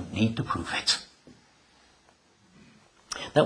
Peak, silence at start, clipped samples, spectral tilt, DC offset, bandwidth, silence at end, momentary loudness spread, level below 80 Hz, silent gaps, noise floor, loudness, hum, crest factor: -6 dBFS; 0 s; under 0.1%; -4 dB/octave; under 0.1%; 10.5 kHz; 0 s; 13 LU; -58 dBFS; none; -62 dBFS; -28 LUFS; none; 26 dB